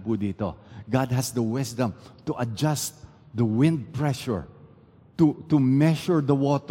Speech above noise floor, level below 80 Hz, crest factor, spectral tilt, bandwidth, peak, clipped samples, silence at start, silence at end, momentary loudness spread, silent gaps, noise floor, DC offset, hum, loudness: 29 dB; -56 dBFS; 18 dB; -6.5 dB/octave; 17 kHz; -8 dBFS; under 0.1%; 0 s; 0 s; 11 LU; none; -53 dBFS; under 0.1%; none; -25 LUFS